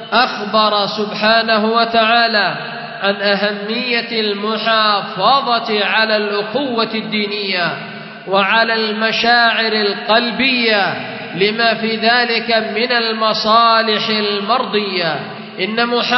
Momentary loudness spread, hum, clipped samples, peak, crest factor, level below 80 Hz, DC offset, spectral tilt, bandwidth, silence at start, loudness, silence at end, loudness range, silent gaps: 7 LU; none; under 0.1%; 0 dBFS; 16 dB; -62 dBFS; under 0.1%; -5 dB/octave; 6.2 kHz; 0 s; -14 LUFS; 0 s; 2 LU; none